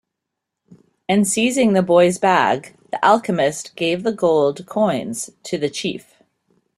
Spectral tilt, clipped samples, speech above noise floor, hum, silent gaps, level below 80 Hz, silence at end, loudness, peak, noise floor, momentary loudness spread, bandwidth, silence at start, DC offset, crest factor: -4.5 dB/octave; under 0.1%; 63 dB; none; none; -62 dBFS; 0.8 s; -18 LUFS; -2 dBFS; -81 dBFS; 12 LU; 13.5 kHz; 1.1 s; under 0.1%; 18 dB